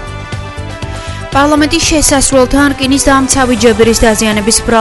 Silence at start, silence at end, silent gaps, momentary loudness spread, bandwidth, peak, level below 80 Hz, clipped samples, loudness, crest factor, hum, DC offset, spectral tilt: 0 s; 0 s; none; 14 LU; 12 kHz; 0 dBFS; -24 dBFS; 0.7%; -8 LUFS; 10 dB; none; under 0.1%; -3.5 dB/octave